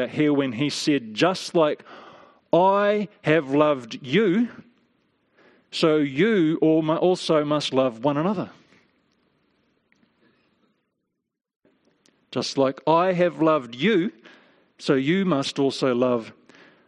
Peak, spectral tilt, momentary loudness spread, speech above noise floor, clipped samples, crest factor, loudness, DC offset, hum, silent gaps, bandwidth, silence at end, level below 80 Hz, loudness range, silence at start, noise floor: -4 dBFS; -6 dB/octave; 8 LU; 60 dB; under 0.1%; 20 dB; -22 LUFS; under 0.1%; none; 11.56-11.60 s; 11.5 kHz; 0.55 s; -70 dBFS; 7 LU; 0 s; -81 dBFS